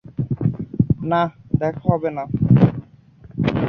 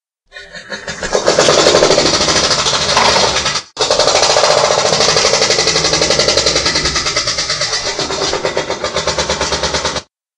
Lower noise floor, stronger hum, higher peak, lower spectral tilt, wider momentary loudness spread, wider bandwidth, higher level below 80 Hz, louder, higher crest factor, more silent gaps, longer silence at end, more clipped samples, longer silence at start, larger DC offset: first, -46 dBFS vs -37 dBFS; neither; about the same, -2 dBFS vs 0 dBFS; first, -10.5 dB/octave vs -1.5 dB/octave; about the same, 9 LU vs 9 LU; second, 5.8 kHz vs 11.5 kHz; second, -42 dBFS vs -36 dBFS; second, -20 LUFS vs -12 LUFS; about the same, 18 dB vs 14 dB; neither; second, 0 s vs 0.35 s; second, under 0.1% vs 0.1%; second, 0.1 s vs 0.35 s; neither